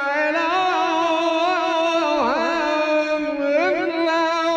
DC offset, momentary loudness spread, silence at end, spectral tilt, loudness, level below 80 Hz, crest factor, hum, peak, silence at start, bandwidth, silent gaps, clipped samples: under 0.1%; 1 LU; 0 s; -3 dB/octave; -20 LUFS; -60 dBFS; 12 dB; none; -8 dBFS; 0 s; 9 kHz; none; under 0.1%